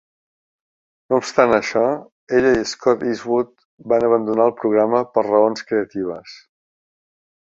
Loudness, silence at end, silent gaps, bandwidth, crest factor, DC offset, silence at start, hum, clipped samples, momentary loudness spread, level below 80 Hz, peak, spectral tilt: -18 LUFS; 1.2 s; 2.12-2.27 s, 3.65-3.78 s; 7.8 kHz; 18 dB; under 0.1%; 1.1 s; none; under 0.1%; 9 LU; -56 dBFS; -2 dBFS; -5 dB/octave